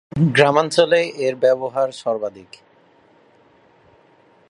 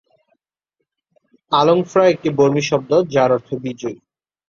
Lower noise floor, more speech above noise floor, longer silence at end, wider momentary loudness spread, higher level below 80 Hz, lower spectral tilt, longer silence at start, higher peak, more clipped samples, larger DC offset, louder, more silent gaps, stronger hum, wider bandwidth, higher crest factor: second, -54 dBFS vs -77 dBFS; second, 36 dB vs 61 dB; first, 2.1 s vs 0.55 s; second, 9 LU vs 12 LU; about the same, -58 dBFS vs -60 dBFS; about the same, -5.5 dB/octave vs -6 dB/octave; second, 0.15 s vs 1.5 s; about the same, 0 dBFS vs -2 dBFS; neither; neither; about the same, -18 LUFS vs -16 LUFS; neither; neither; first, 11.5 kHz vs 7.4 kHz; about the same, 20 dB vs 18 dB